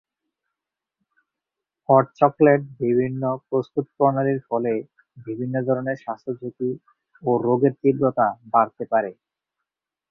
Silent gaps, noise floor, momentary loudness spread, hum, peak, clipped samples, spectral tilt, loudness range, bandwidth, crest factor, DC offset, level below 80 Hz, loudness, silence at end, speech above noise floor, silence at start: none; -86 dBFS; 13 LU; none; -2 dBFS; under 0.1%; -11 dB/octave; 4 LU; 6.2 kHz; 22 dB; under 0.1%; -66 dBFS; -22 LUFS; 1 s; 65 dB; 1.9 s